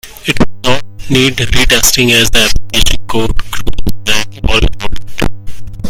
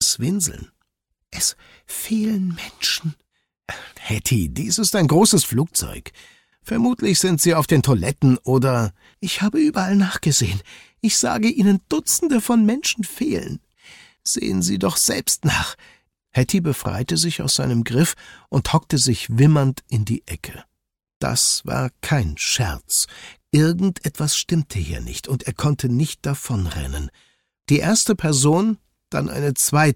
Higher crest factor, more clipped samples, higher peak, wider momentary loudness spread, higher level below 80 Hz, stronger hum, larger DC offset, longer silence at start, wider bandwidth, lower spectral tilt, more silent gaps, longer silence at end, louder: second, 8 dB vs 18 dB; first, 1% vs under 0.1%; first, 0 dBFS vs -4 dBFS; about the same, 13 LU vs 12 LU; first, -18 dBFS vs -42 dBFS; neither; neither; about the same, 0.05 s vs 0 s; first, over 20 kHz vs 17 kHz; second, -3 dB/octave vs -4.5 dB/octave; second, none vs 21.16-21.21 s; about the same, 0 s vs 0 s; first, -11 LUFS vs -19 LUFS